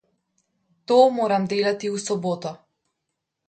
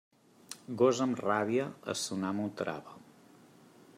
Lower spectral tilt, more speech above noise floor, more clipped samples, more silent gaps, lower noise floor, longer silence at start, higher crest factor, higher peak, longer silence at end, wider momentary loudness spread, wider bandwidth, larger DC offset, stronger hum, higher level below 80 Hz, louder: about the same, -5 dB/octave vs -4.5 dB/octave; first, 60 dB vs 27 dB; neither; neither; first, -80 dBFS vs -59 dBFS; first, 0.9 s vs 0.5 s; about the same, 20 dB vs 20 dB; first, -4 dBFS vs -14 dBFS; about the same, 0.9 s vs 1 s; second, 11 LU vs 18 LU; second, 9.2 kHz vs 15 kHz; neither; neither; first, -72 dBFS vs -80 dBFS; first, -22 LUFS vs -32 LUFS